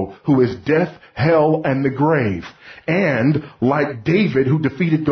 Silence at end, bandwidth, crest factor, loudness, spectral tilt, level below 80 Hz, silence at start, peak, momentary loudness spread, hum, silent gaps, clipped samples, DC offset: 0 s; 6.4 kHz; 14 dB; -18 LUFS; -9 dB/octave; -48 dBFS; 0 s; -4 dBFS; 6 LU; none; none; under 0.1%; under 0.1%